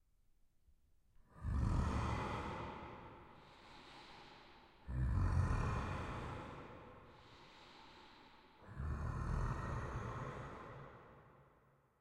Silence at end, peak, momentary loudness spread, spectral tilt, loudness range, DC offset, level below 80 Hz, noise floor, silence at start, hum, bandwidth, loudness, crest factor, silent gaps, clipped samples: 0.6 s; -24 dBFS; 22 LU; -7 dB/octave; 5 LU; under 0.1%; -48 dBFS; -72 dBFS; 1.35 s; none; 10.5 kHz; -43 LUFS; 20 dB; none; under 0.1%